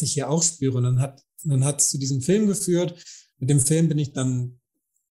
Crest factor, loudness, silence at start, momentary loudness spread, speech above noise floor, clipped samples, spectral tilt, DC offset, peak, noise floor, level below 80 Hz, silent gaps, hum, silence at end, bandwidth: 16 dB; -22 LUFS; 0 s; 11 LU; 54 dB; under 0.1%; -5 dB/octave; under 0.1%; -6 dBFS; -76 dBFS; -58 dBFS; none; none; 0.6 s; 15.5 kHz